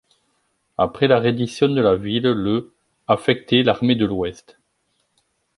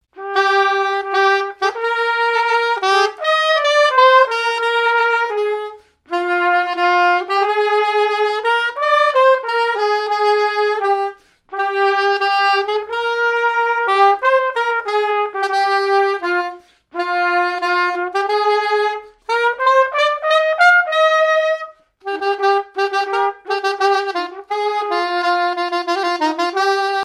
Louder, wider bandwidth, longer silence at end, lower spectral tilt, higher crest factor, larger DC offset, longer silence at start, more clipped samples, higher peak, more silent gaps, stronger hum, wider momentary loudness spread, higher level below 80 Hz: second, -19 LUFS vs -16 LUFS; about the same, 11.5 kHz vs 12.5 kHz; first, 1.25 s vs 0 s; first, -6.5 dB/octave vs -0.5 dB/octave; about the same, 18 dB vs 16 dB; neither; first, 0.8 s vs 0.15 s; neither; about the same, -2 dBFS vs 0 dBFS; neither; neither; about the same, 9 LU vs 8 LU; first, -50 dBFS vs -68 dBFS